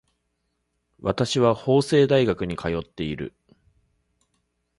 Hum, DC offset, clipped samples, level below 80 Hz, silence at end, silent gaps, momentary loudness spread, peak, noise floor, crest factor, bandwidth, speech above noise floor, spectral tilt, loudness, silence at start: none; under 0.1%; under 0.1%; -50 dBFS; 1.5 s; none; 12 LU; -4 dBFS; -75 dBFS; 20 dB; 11.5 kHz; 53 dB; -6 dB/octave; -23 LUFS; 1 s